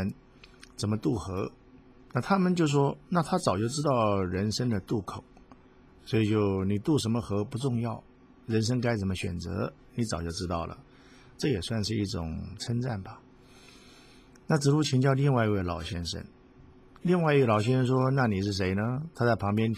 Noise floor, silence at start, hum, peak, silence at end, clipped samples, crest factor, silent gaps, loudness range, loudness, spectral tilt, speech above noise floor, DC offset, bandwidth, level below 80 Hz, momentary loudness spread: -56 dBFS; 0 s; none; -10 dBFS; 0 s; under 0.1%; 18 dB; none; 6 LU; -29 LUFS; -6.5 dB/octave; 28 dB; under 0.1%; 14.5 kHz; -48 dBFS; 11 LU